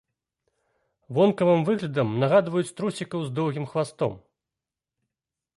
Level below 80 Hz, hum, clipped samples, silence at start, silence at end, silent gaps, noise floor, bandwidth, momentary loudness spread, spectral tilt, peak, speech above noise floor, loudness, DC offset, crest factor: -66 dBFS; none; under 0.1%; 1.1 s; 1.4 s; none; -89 dBFS; 11.5 kHz; 9 LU; -7 dB/octave; -8 dBFS; 65 dB; -25 LUFS; under 0.1%; 18 dB